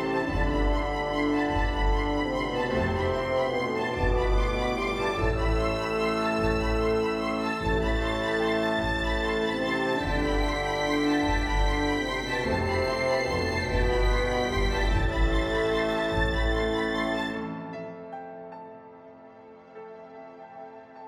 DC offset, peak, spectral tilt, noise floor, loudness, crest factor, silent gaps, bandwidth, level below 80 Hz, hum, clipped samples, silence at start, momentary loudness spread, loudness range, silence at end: under 0.1%; -14 dBFS; -6 dB/octave; -49 dBFS; -27 LUFS; 14 dB; none; 12.5 kHz; -32 dBFS; none; under 0.1%; 0 s; 14 LU; 5 LU; 0 s